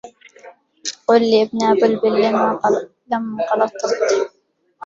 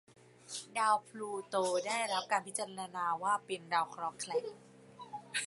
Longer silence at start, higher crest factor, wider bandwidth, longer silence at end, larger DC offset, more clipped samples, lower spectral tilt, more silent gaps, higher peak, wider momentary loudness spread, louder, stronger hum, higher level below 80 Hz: second, 0.05 s vs 0.45 s; about the same, 16 dB vs 20 dB; second, 7.8 kHz vs 11.5 kHz; about the same, 0 s vs 0 s; neither; neither; first, -4 dB/octave vs -2 dB/octave; neither; first, -2 dBFS vs -16 dBFS; second, 9 LU vs 13 LU; first, -18 LUFS vs -36 LUFS; neither; first, -64 dBFS vs -86 dBFS